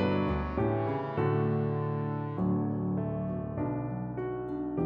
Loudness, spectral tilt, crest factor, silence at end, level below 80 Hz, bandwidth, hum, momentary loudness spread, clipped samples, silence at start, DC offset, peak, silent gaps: -32 LUFS; -11 dB/octave; 14 dB; 0 s; -48 dBFS; 5.4 kHz; none; 6 LU; under 0.1%; 0 s; under 0.1%; -16 dBFS; none